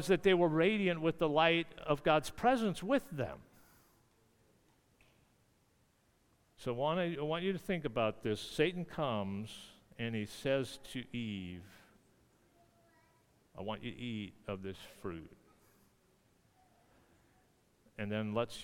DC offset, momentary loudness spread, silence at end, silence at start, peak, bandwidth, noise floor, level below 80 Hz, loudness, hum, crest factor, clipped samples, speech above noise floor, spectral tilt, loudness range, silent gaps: under 0.1%; 16 LU; 0 s; 0 s; -14 dBFS; 18 kHz; -72 dBFS; -64 dBFS; -36 LUFS; none; 24 dB; under 0.1%; 37 dB; -6 dB/octave; 16 LU; none